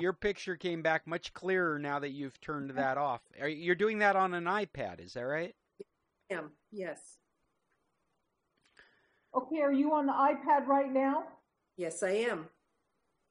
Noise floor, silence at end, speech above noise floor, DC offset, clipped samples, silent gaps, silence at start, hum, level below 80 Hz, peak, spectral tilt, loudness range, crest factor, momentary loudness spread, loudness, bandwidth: -81 dBFS; 0.85 s; 48 dB; under 0.1%; under 0.1%; none; 0 s; none; -70 dBFS; -14 dBFS; -5.5 dB/octave; 14 LU; 20 dB; 14 LU; -33 LUFS; 10.5 kHz